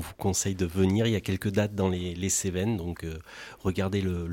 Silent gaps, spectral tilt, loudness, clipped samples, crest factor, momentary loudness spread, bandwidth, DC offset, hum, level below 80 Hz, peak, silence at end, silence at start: none; -5 dB/octave; -28 LUFS; under 0.1%; 16 dB; 10 LU; 17 kHz; under 0.1%; none; -48 dBFS; -12 dBFS; 0 s; 0 s